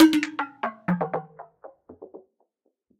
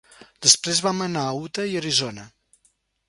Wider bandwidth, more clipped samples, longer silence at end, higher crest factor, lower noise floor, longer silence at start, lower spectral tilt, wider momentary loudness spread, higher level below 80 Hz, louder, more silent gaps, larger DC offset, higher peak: second, 14.5 kHz vs 16 kHz; neither; about the same, 0.8 s vs 0.8 s; about the same, 20 dB vs 24 dB; first, -72 dBFS vs -66 dBFS; second, 0 s vs 0.4 s; first, -5.5 dB/octave vs -2 dB/octave; first, 22 LU vs 12 LU; second, -70 dBFS vs -64 dBFS; second, -26 LUFS vs -21 LUFS; neither; neither; second, -6 dBFS vs 0 dBFS